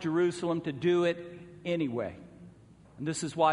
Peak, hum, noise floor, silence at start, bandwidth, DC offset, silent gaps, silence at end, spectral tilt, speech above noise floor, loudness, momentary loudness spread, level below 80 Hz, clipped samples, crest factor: -12 dBFS; none; -56 dBFS; 0 s; 10.5 kHz; under 0.1%; none; 0 s; -5.5 dB/octave; 26 dB; -31 LUFS; 15 LU; -66 dBFS; under 0.1%; 18 dB